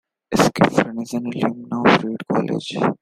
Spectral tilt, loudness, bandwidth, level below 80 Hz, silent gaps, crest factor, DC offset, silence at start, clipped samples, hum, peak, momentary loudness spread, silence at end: -5.5 dB/octave; -20 LUFS; 15.5 kHz; -52 dBFS; none; 18 dB; under 0.1%; 0.3 s; under 0.1%; none; 0 dBFS; 8 LU; 0.05 s